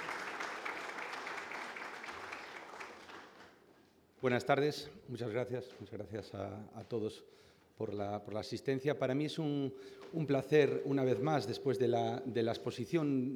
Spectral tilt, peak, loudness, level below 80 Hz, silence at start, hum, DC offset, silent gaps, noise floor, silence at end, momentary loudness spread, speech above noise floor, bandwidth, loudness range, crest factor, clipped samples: -6.5 dB/octave; -16 dBFS; -37 LUFS; -76 dBFS; 0 s; none; under 0.1%; none; -66 dBFS; 0 s; 15 LU; 30 dB; 17 kHz; 9 LU; 22 dB; under 0.1%